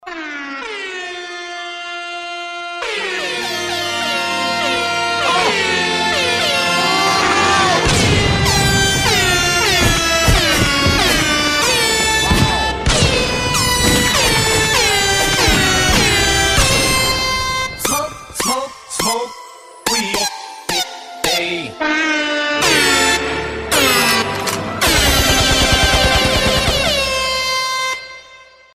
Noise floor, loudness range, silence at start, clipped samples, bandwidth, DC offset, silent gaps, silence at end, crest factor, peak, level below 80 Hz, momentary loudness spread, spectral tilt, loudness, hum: -43 dBFS; 7 LU; 0.05 s; under 0.1%; 15.5 kHz; under 0.1%; none; 0.3 s; 16 dB; 0 dBFS; -28 dBFS; 13 LU; -2.5 dB/octave; -14 LUFS; none